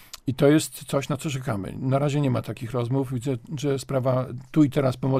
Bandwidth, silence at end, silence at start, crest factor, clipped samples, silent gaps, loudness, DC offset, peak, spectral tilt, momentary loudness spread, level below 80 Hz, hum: 15.5 kHz; 0 s; 0 s; 18 dB; under 0.1%; none; -25 LUFS; under 0.1%; -6 dBFS; -6.5 dB/octave; 9 LU; -54 dBFS; none